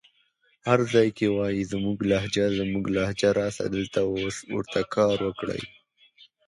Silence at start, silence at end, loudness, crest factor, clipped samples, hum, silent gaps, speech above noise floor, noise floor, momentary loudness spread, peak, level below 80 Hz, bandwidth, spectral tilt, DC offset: 0.65 s; 0.8 s; -26 LUFS; 20 dB; under 0.1%; none; none; 42 dB; -67 dBFS; 9 LU; -4 dBFS; -52 dBFS; 11.5 kHz; -5.5 dB/octave; under 0.1%